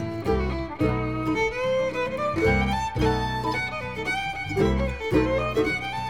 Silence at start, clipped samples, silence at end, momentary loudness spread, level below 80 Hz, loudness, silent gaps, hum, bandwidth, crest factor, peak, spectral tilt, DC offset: 0 s; under 0.1%; 0 s; 5 LU; -36 dBFS; -25 LUFS; none; none; 16 kHz; 16 dB; -8 dBFS; -6.5 dB/octave; 0.4%